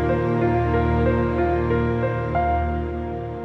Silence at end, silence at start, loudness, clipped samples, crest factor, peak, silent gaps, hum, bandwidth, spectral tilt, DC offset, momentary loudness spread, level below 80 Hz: 0 s; 0 s; -22 LUFS; under 0.1%; 12 dB; -8 dBFS; none; none; 6 kHz; -10 dB/octave; under 0.1%; 7 LU; -30 dBFS